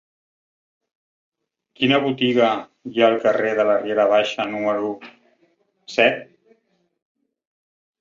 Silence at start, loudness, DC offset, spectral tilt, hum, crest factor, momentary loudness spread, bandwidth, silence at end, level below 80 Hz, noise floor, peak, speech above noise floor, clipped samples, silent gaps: 1.8 s; -19 LUFS; under 0.1%; -5.5 dB/octave; none; 20 dB; 11 LU; 7.6 kHz; 1.8 s; -68 dBFS; -65 dBFS; -2 dBFS; 46 dB; under 0.1%; none